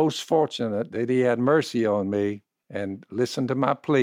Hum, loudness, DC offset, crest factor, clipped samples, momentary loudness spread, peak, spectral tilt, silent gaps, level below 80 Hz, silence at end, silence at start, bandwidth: none; -25 LUFS; under 0.1%; 16 dB; under 0.1%; 11 LU; -8 dBFS; -6 dB/octave; none; -72 dBFS; 0 s; 0 s; 16 kHz